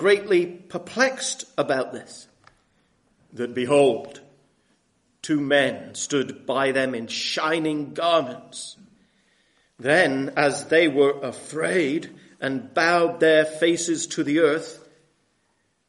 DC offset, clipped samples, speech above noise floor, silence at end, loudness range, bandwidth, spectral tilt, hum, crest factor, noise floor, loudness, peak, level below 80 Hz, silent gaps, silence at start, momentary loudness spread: under 0.1%; under 0.1%; 47 dB; 1.15 s; 5 LU; 11.5 kHz; -3.5 dB/octave; none; 18 dB; -69 dBFS; -22 LUFS; -4 dBFS; -70 dBFS; none; 0 s; 14 LU